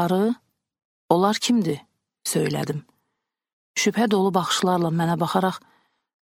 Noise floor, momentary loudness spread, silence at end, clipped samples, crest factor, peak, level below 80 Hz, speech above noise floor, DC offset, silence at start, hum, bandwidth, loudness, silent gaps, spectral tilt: -80 dBFS; 11 LU; 0.8 s; under 0.1%; 22 dB; -2 dBFS; -66 dBFS; 58 dB; under 0.1%; 0 s; none; 16.5 kHz; -23 LUFS; 0.85-1.09 s, 3.53-3.74 s; -5 dB/octave